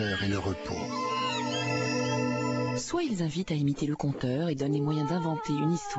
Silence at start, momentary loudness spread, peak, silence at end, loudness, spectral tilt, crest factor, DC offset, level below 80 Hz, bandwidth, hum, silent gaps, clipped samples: 0 s; 3 LU; -16 dBFS; 0 s; -30 LUFS; -5.5 dB/octave; 12 dB; under 0.1%; -56 dBFS; 8.2 kHz; none; none; under 0.1%